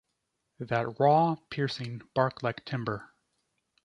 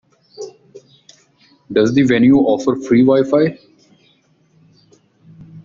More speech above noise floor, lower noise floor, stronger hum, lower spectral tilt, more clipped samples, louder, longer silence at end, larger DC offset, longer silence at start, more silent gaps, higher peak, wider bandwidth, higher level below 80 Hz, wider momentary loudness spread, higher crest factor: first, 52 dB vs 43 dB; first, -81 dBFS vs -56 dBFS; neither; about the same, -7 dB/octave vs -7 dB/octave; neither; second, -29 LUFS vs -14 LUFS; first, 0.8 s vs 0.05 s; neither; first, 0.6 s vs 0.4 s; neither; second, -10 dBFS vs -2 dBFS; first, 10.5 kHz vs 7.4 kHz; second, -66 dBFS vs -54 dBFS; second, 13 LU vs 23 LU; about the same, 20 dB vs 16 dB